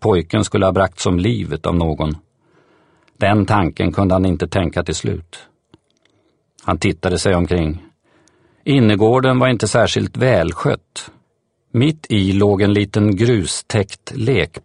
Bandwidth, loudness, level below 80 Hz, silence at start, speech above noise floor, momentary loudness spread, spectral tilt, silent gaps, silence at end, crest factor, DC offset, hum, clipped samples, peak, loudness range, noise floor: 11 kHz; -17 LUFS; -38 dBFS; 0 s; 49 dB; 10 LU; -6 dB/octave; none; 0.05 s; 16 dB; under 0.1%; none; under 0.1%; 0 dBFS; 5 LU; -65 dBFS